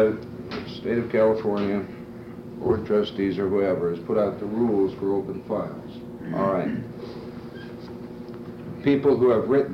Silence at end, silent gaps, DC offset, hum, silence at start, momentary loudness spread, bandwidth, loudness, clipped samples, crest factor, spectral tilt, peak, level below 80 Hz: 0 s; none; under 0.1%; none; 0 s; 17 LU; 6.4 kHz; -24 LUFS; under 0.1%; 14 dB; -8.5 dB/octave; -10 dBFS; -56 dBFS